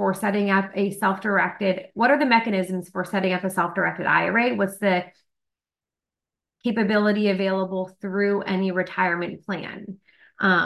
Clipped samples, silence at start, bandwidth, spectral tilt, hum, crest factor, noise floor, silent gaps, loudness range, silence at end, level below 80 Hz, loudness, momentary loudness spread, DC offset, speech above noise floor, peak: under 0.1%; 0 s; 12.5 kHz; -6 dB/octave; none; 18 dB; under -90 dBFS; none; 3 LU; 0 s; -68 dBFS; -23 LUFS; 10 LU; under 0.1%; over 67 dB; -4 dBFS